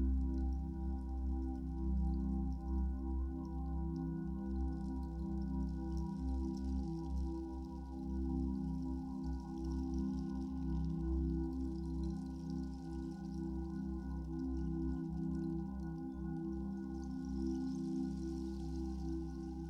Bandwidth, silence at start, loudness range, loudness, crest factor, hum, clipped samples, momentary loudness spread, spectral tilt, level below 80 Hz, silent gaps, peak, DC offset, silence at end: 6.8 kHz; 0 s; 2 LU; -42 LUFS; 12 dB; none; under 0.1%; 5 LU; -9.5 dB/octave; -42 dBFS; none; -28 dBFS; under 0.1%; 0 s